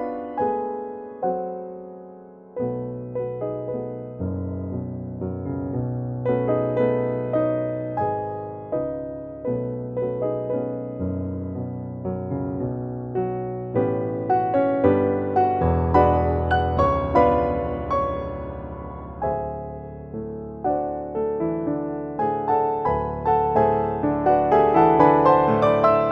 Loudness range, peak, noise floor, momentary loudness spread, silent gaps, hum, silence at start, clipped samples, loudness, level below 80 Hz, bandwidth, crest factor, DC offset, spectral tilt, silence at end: 10 LU; -2 dBFS; -43 dBFS; 14 LU; none; none; 0 s; under 0.1%; -23 LUFS; -40 dBFS; 6.2 kHz; 20 dB; under 0.1%; -10 dB/octave; 0 s